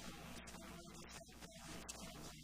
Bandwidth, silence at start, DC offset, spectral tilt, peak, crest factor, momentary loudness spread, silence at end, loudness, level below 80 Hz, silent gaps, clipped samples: 15.5 kHz; 0 s; under 0.1%; -3 dB/octave; -34 dBFS; 20 dB; 4 LU; 0 s; -54 LUFS; -64 dBFS; none; under 0.1%